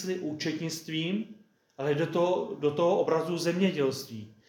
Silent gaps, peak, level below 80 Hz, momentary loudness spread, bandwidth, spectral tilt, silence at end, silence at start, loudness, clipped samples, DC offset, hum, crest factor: none; -12 dBFS; -80 dBFS; 9 LU; 17 kHz; -5.5 dB/octave; 0.2 s; 0 s; -29 LUFS; under 0.1%; under 0.1%; none; 16 dB